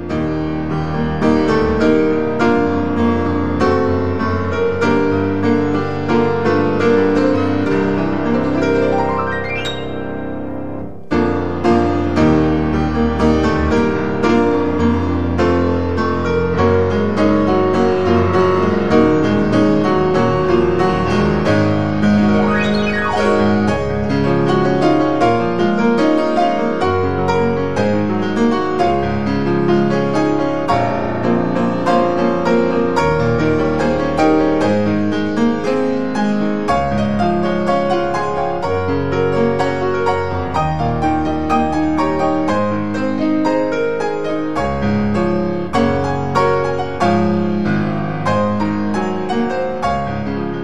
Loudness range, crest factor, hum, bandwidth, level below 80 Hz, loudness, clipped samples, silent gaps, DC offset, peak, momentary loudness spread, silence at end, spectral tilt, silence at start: 3 LU; 14 dB; none; 10 kHz; -36 dBFS; -16 LUFS; under 0.1%; none; 3%; 0 dBFS; 5 LU; 0 s; -7.5 dB/octave; 0 s